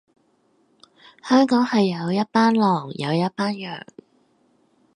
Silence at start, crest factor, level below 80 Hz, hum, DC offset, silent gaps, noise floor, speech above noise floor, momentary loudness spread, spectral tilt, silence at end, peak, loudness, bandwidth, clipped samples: 1.25 s; 18 dB; -72 dBFS; none; under 0.1%; none; -63 dBFS; 43 dB; 14 LU; -6.5 dB/octave; 1.15 s; -6 dBFS; -20 LUFS; 11 kHz; under 0.1%